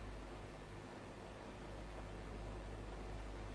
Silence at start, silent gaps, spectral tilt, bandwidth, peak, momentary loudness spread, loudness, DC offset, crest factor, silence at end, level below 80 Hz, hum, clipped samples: 0 s; none; -6 dB/octave; 11 kHz; -38 dBFS; 3 LU; -52 LUFS; under 0.1%; 12 dB; 0 s; -54 dBFS; none; under 0.1%